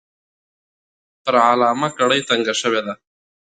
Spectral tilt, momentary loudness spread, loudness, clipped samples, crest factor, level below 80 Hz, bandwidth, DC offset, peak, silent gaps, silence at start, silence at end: -3 dB/octave; 13 LU; -17 LUFS; under 0.1%; 20 dB; -70 dBFS; 9.4 kHz; under 0.1%; -2 dBFS; none; 1.25 s; 0.65 s